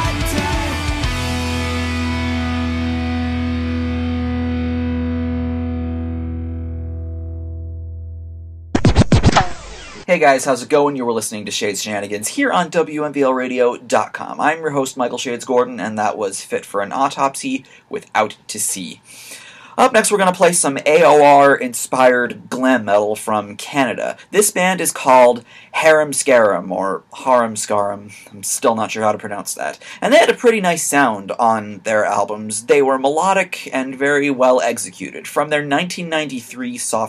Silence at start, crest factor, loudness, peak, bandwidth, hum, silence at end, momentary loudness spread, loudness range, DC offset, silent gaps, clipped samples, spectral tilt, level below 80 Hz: 0 s; 16 dB; -17 LUFS; 0 dBFS; 15.5 kHz; none; 0 s; 14 LU; 8 LU; under 0.1%; none; under 0.1%; -4.5 dB/octave; -34 dBFS